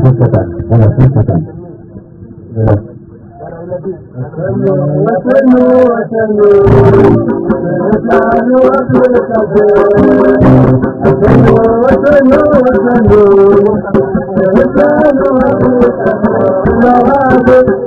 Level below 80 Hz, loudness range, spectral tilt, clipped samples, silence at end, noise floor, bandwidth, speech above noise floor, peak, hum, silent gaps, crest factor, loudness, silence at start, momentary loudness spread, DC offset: -28 dBFS; 7 LU; -10.5 dB/octave; 3%; 0 s; -31 dBFS; 6 kHz; 24 dB; 0 dBFS; none; none; 8 dB; -8 LUFS; 0 s; 9 LU; under 0.1%